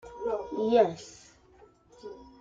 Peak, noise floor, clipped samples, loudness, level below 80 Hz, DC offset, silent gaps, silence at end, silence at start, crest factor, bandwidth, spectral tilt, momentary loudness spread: -12 dBFS; -59 dBFS; under 0.1%; -28 LUFS; -62 dBFS; under 0.1%; none; 0.2 s; 0.05 s; 20 dB; 7.8 kHz; -5.5 dB/octave; 23 LU